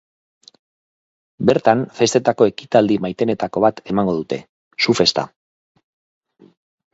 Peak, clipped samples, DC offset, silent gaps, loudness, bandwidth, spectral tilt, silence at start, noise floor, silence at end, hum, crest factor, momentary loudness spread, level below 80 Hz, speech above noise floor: 0 dBFS; under 0.1%; under 0.1%; 4.49-4.71 s; -18 LUFS; 8 kHz; -5 dB/octave; 1.4 s; under -90 dBFS; 1.65 s; none; 20 dB; 10 LU; -56 dBFS; over 73 dB